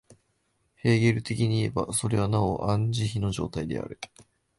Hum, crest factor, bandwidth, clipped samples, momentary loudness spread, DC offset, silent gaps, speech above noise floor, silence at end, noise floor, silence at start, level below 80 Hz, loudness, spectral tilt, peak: none; 16 dB; 12 kHz; under 0.1%; 11 LU; under 0.1%; none; 46 dB; 0.35 s; -72 dBFS; 0.1 s; -48 dBFS; -27 LUFS; -6 dB/octave; -10 dBFS